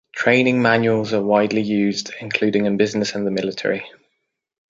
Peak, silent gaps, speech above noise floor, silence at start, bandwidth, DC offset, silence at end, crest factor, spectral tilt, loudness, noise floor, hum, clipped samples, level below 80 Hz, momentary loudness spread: -2 dBFS; none; 56 dB; 0.15 s; 7.8 kHz; under 0.1%; 0.8 s; 18 dB; -5.5 dB/octave; -19 LUFS; -74 dBFS; none; under 0.1%; -60 dBFS; 8 LU